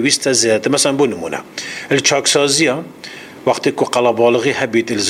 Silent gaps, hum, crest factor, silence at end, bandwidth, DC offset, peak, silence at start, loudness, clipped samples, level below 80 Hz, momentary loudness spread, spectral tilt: none; none; 16 dB; 0 s; 15.5 kHz; under 0.1%; 0 dBFS; 0 s; -15 LUFS; under 0.1%; -58 dBFS; 12 LU; -2.5 dB/octave